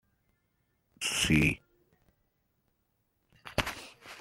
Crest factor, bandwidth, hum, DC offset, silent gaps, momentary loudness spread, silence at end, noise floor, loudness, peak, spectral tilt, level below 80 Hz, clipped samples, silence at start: 28 dB; 16.5 kHz; none; under 0.1%; none; 18 LU; 0 s; -77 dBFS; -29 LUFS; -8 dBFS; -3.5 dB/octave; -52 dBFS; under 0.1%; 1 s